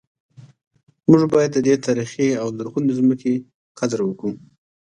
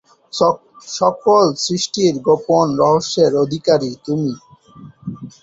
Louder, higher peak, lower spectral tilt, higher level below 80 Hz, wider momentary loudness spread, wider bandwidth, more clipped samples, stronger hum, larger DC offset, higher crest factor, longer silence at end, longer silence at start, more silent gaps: second, -20 LUFS vs -16 LUFS; about the same, 0 dBFS vs -2 dBFS; first, -6.5 dB/octave vs -5 dB/octave; second, -62 dBFS vs -56 dBFS; second, 11 LU vs 16 LU; first, 10 kHz vs 8 kHz; neither; neither; neither; about the same, 20 dB vs 16 dB; first, 0.6 s vs 0.15 s; about the same, 0.4 s vs 0.35 s; first, 0.67-0.71 s, 0.83-0.87 s, 3.54-3.75 s vs none